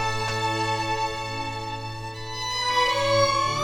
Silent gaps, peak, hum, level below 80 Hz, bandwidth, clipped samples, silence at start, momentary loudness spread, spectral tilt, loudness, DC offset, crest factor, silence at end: none; -10 dBFS; none; -46 dBFS; 19 kHz; under 0.1%; 0 s; 12 LU; -3.5 dB/octave; -25 LUFS; under 0.1%; 16 dB; 0 s